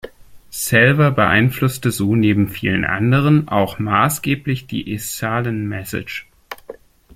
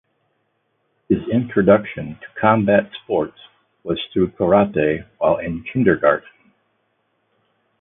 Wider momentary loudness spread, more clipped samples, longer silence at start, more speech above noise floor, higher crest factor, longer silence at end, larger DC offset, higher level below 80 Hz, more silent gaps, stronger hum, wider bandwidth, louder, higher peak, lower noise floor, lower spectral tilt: first, 15 LU vs 11 LU; neither; second, 0.05 s vs 1.1 s; second, 23 dB vs 51 dB; about the same, 18 dB vs 20 dB; second, 0.45 s vs 1.6 s; neither; about the same, -46 dBFS vs -48 dBFS; neither; neither; first, 16.5 kHz vs 3.8 kHz; about the same, -17 LUFS vs -19 LUFS; about the same, 0 dBFS vs 0 dBFS; second, -40 dBFS vs -69 dBFS; second, -5.5 dB/octave vs -11.5 dB/octave